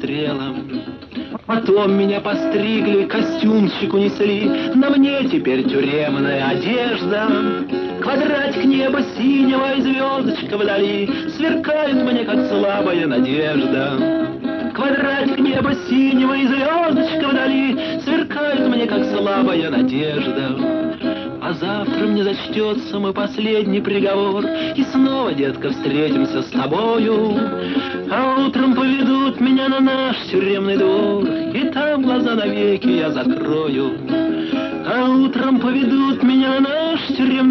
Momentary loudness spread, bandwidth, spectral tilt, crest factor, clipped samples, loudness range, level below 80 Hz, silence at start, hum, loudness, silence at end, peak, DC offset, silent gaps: 6 LU; 6.2 kHz; -7 dB/octave; 12 dB; under 0.1%; 2 LU; -54 dBFS; 0 s; none; -18 LUFS; 0 s; -4 dBFS; under 0.1%; none